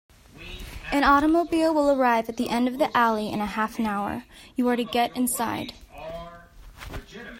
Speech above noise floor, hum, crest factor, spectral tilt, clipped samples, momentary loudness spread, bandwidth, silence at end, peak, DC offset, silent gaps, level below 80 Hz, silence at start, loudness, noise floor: 23 dB; none; 18 dB; -4 dB/octave; under 0.1%; 20 LU; 16 kHz; 0 s; -6 dBFS; under 0.1%; none; -48 dBFS; 0.35 s; -24 LUFS; -46 dBFS